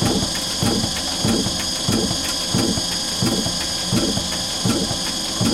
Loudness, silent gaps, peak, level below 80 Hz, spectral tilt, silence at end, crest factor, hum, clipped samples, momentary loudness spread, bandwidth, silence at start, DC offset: -20 LUFS; none; -6 dBFS; -38 dBFS; -3 dB/octave; 0 s; 16 dB; none; under 0.1%; 2 LU; 17 kHz; 0 s; under 0.1%